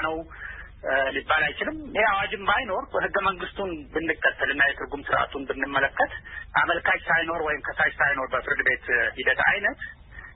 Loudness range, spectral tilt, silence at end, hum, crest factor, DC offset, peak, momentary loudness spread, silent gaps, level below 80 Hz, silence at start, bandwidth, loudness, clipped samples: 2 LU; -8 dB/octave; 0 s; none; 18 dB; under 0.1%; -8 dBFS; 11 LU; none; -48 dBFS; 0 s; 4.1 kHz; -24 LUFS; under 0.1%